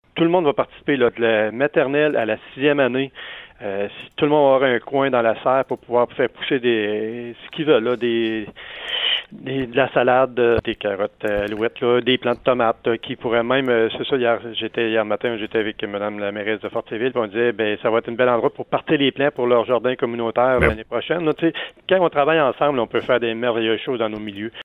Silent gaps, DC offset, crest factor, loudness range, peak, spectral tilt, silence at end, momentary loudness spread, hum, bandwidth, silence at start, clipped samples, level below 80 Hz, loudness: none; under 0.1%; 18 dB; 3 LU; -2 dBFS; -7.5 dB/octave; 0 s; 8 LU; none; 4.3 kHz; 0.15 s; under 0.1%; -46 dBFS; -20 LUFS